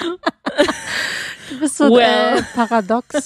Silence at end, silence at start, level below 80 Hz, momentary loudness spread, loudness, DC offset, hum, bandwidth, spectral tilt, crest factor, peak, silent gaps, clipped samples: 0 s; 0 s; -52 dBFS; 11 LU; -16 LUFS; under 0.1%; none; 15 kHz; -3 dB/octave; 16 dB; 0 dBFS; none; under 0.1%